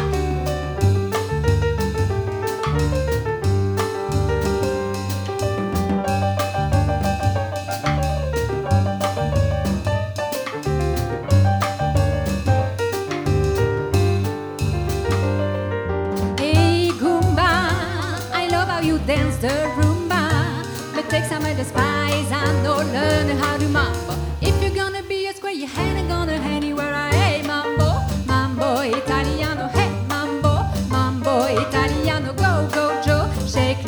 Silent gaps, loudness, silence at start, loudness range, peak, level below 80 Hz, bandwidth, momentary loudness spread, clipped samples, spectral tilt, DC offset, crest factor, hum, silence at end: none; -21 LUFS; 0 s; 2 LU; -4 dBFS; -32 dBFS; over 20 kHz; 5 LU; under 0.1%; -6 dB/octave; under 0.1%; 16 dB; none; 0 s